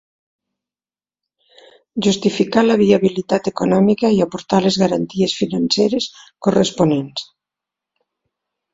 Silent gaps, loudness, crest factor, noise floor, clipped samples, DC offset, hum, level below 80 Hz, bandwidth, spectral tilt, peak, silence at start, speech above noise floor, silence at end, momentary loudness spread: none; -17 LUFS; 18 dB; under -90 dBFS; under 0.1%; under 0.1%; none; -54 dBFS; 7.8 kHz; -5.5 dB/octave; 0 dBFS; 1.95 s; over 74 dB; 1.5 s; 8 LU